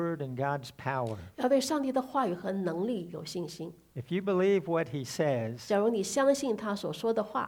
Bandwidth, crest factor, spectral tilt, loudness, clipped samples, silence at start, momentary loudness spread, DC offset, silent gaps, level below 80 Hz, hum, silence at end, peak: 20 kHz; 16 dB; -5.5 dB/octave; -31 LUFS; under 0.1%; 0 s; 11 LU; under 0.1%; none; -68 dBFS; none; 0 s; -14 dBFS